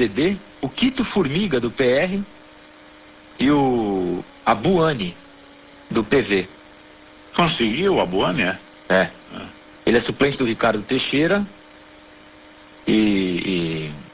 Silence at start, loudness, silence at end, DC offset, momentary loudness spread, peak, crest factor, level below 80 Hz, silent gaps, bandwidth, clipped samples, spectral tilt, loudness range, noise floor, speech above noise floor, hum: 0 s; -20 LUFS; 0.05 s; under 0.1%; 11 LU; -4 dBFS; 18 dB; -48 dBFS; none; 4 kHz; under 0.1%; -10 dB/octave; 2 LU; -46 dBFS; 26 dB; none